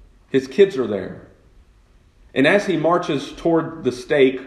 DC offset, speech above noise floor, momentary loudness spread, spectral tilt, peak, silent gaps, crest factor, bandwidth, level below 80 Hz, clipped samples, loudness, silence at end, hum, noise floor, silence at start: under 0.1%; 34 dB; 9 LU; -6 dB/octave; -2 dBFS; none; 20 dB; 11 kHz; -52 dBFS; under 0.1%; -19 LUFS; 0 s; none; -53 dBFS; 0.35 s